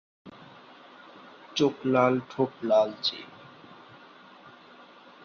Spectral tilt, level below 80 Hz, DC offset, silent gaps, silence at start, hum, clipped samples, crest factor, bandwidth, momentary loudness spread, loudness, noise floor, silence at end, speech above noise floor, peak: -5.5 dB/octave; -74 dBFS; under 0.1%; none; 0.25 s; none; under 0.1%; 22 dB; 6.8 kHz; 26 LU; -26 LUFS; -52 dBFS; 2 s; 26 dB; -8 dBFS